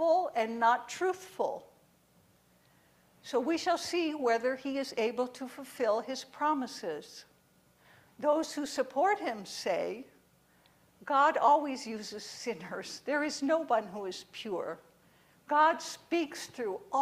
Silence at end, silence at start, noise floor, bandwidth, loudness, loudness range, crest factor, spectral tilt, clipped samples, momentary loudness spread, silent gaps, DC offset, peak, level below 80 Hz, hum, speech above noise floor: 0 s; 0 s; -66 dBFS; 15.5 kHz; -32 LUFS; 4 LU; 20 dB; -3 dB/octave; under 0.1%; 14 LU; none; under 0.1%; -14 dBFS; -78 dBFS; none; 35 dB